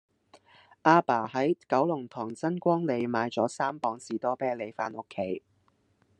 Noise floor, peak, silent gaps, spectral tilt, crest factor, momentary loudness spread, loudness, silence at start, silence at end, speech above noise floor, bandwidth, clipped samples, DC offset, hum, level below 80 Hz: -69 dBFS; -6 dBFS; none; -6.5 dB/octave; 24 dB; 12 LU; -29 LUFS; 0.85 s; 0.8 s; 41 dB; 10.5 kHz; under 0.1%; under 0.1%; none; -80 dBFS